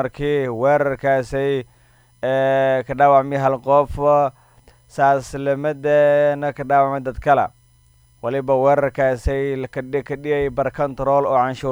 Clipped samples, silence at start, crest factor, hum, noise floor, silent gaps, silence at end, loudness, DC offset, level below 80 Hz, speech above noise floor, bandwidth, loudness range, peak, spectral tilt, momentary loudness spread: under 0.1%; 0 s; 16 dB; none; -54 dBFS; none; 0 s; -19 LUFS; under 0.1%; -40 dBFS; 36 dB; over 20 kHz; 3 LU; -2 dBFS; -7 dB/octave; 9 LU